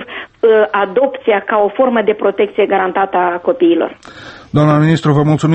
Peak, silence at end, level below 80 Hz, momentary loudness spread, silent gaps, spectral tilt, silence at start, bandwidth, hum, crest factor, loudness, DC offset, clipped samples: 0 dBFS; 0 s; -50 dBFS; 7 LU; none; -7.5 dB/octave; 0 s; 8.4 kHz; none; 12 dB; -13 LUFS; under 0.1%; under 0.1%